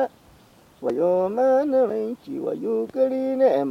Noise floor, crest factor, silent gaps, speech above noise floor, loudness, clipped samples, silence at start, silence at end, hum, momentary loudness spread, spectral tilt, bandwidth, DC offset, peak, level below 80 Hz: -53 dBFS; 14 dB; none; 31 dB; -23 LUFS; under 0.1%; 0 s; 0 s; none; 10 LU; -7.5 dB/octave; 6.2 kHz; under 0.1%; -8 dBFS; -66 dBFS